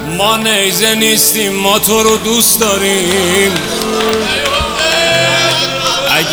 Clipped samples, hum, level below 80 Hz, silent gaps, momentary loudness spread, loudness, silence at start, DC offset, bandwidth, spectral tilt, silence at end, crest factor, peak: under 0.1%; none; -38 dBFS; none; 4 LU; -10 LUFS; 0 s; under 0.1%; over 20 kHz; -2 dB/octave; 0 s; 12 dB; 0 dBFS